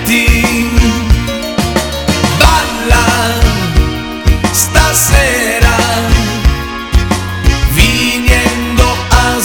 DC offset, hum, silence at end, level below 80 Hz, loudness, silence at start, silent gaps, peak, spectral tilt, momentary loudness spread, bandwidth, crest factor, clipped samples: under 0.1%; none; 0 s; -14 dBFS; -11 LUFS; 0 s; none; 0 dBFS; -4 dB/octave; 6 LU; over 20 kHz; 10 dB; 1%